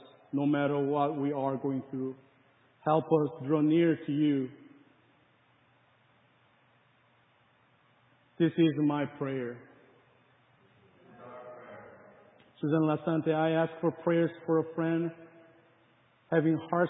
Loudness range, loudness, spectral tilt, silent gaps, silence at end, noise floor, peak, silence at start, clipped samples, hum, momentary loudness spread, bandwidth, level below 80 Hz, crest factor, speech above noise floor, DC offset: 8 LU; -30 LUFS; -11 dB/octave; none; 0 s; -67 dBFS; -14 dBFS; 0.35 s; under 0.1%; none; 16 LU; 3.9 kHz; -78 dBFS; 18 dB; 38 dB; under 0.1%